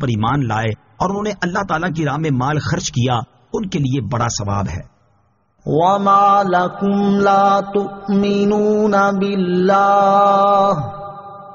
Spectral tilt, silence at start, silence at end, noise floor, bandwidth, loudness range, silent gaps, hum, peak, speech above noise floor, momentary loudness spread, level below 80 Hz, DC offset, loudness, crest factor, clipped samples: -5.5 dB/octave; 0 s; 0 s; -59 dBFS; 7.2 kHz; 6 LU; none; none; -2 dBFS; 44 dB; 10 LU; -44 dBFS; under 0.1%; -16 LUFS; 14 dB; under 0.1%